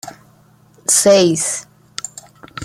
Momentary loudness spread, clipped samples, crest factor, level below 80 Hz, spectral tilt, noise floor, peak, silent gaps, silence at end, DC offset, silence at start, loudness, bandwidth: 22 LU; under 0.1%; 18 dB; -60 dBFS; -3 dB/octave; -50 dBFS; 0 dBFS; none; 0 s; under 0.1%; 0.05 s; -13 LUFS; 15 kHz